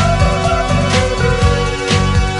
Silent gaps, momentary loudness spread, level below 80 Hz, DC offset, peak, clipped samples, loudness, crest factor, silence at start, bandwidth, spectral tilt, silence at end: none; 2 LU; -20 dBFS; under 0.1%; -2 dBFS; under 0.1%; -14 LUFS; 12 dB; 0 s; 11.5 kHz; -5 dB/octave; 0 s